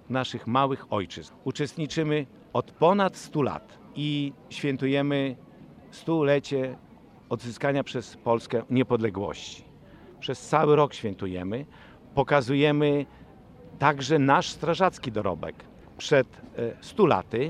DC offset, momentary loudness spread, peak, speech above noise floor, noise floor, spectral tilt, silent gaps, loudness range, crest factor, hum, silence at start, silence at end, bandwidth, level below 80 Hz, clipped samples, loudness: under 0.1%; 14 LU; -4 dBFS; 24 dB; -50 dBFS; -6 dB/octave; none; 4 LU; 22 dB; none; 0.1 s; 0 s; 11.5 kHz; -60 dBFS; under 0.1%; -26 LUFS